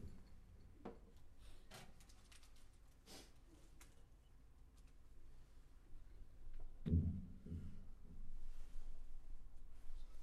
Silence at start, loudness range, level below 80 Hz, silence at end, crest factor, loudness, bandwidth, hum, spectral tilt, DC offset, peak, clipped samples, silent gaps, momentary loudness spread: 0 s; 17 LU; -54 dBFS; 0 s; 24 dB; -51 LUFS; 12 kHz; none; -7 dB/octave; under 0.1%; -26 dBFS; under 0.1%; none; 18 LU